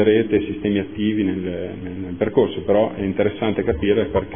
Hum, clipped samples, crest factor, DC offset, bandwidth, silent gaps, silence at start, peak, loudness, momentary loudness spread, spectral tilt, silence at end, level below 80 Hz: none; under 0.1%; 16 dB; 0.5%; 3.6 kHz; none; 0 s; -2 dBFS; -21 LUFS; 9 LU; -11.5 dB/octave; 0 s; -42 dBFS